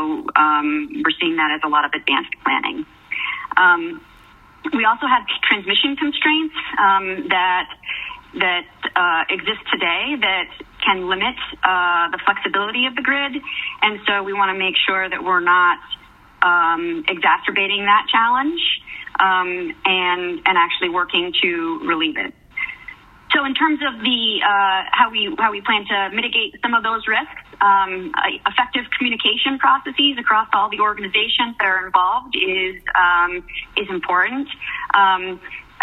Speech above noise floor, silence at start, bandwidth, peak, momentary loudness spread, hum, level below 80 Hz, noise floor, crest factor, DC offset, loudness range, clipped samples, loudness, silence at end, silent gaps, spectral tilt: 28 dB; 0 s; 4.7 kHz; 0 dBFS; 9 LU; none; -54 dBFS; -47 dBFS; 18 dB; under 0.1%; 2 LU; under 0.1%; -18 LUFS; 0.2 s; none; -5 dB/octave